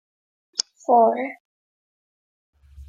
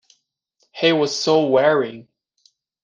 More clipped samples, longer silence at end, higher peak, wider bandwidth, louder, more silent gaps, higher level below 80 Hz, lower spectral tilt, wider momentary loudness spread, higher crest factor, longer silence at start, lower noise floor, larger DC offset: neither; second, 0.05 s vs 0.85 s; about the same, -2 dBFS vs -2 dBFS; about the same, 9.6 kHz vs 9.6 kHz; second, -21 LUFS vs -18 LUFS; first, 1.40-2.53 s vs none; first, -56 dBFS vs -68 dBFS; second, -2.5 dB/octave vs -4.5 dB/octave; about the same, 11 LU vs 10 LU; first, 24 dB vs 18 dB; second, 0.6 s vs 0.75 s; first, under -90 dBFS vs -67 dBFS; neither